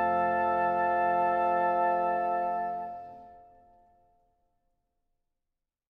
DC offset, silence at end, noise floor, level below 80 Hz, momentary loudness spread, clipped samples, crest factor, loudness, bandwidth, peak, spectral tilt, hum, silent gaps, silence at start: under 0.1%; 2.5 s; -86 dBFS; -68 dBFS; 11 LU; under 0.1%; 14 dB; -28 LUFS; 4.7 kHz; -16 dBFS; -7.5 dB/octave; none; none; 0 s